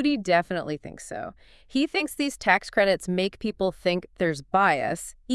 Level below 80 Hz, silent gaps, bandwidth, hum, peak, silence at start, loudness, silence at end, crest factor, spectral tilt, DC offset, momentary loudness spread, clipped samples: -54 dBFS; none; 12 kHz; none; -6 dBFS; 0 s; -25 LUFS; 0 s; 20 dB; -4.5 dB/octave; under 0.1%; 14 LU; under 0.1%